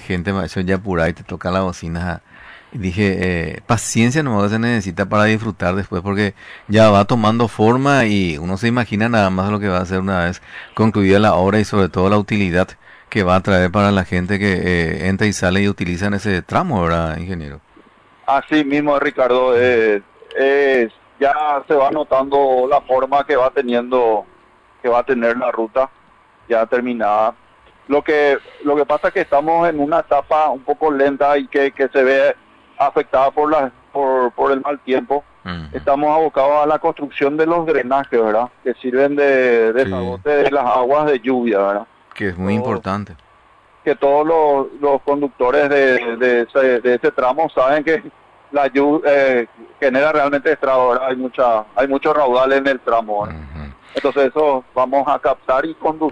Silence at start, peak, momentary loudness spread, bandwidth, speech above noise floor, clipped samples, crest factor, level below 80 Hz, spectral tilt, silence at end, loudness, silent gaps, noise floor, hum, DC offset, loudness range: 0 s; -2 dBFS; 9 LU; 11 kHz; 34 dB; under 0.1%; 14 dB; -44 dBFS; -6 dB/octave; 0 s; -16 LUFS; none; -50 dBFS; none; under 0.1%; 3 LU